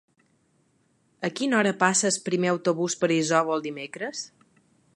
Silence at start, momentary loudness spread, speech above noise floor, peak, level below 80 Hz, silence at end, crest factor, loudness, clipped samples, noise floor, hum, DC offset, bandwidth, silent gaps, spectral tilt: 1.2 s; 12 LU; 42 dB; -6 dBFS; -76 dBFS; 0.7 s; 22 dB; -25 LUFS; under 0.1%; -67 dBFS; none; under 0.1%; 11.5 kHz; none; -3.5 dB/octave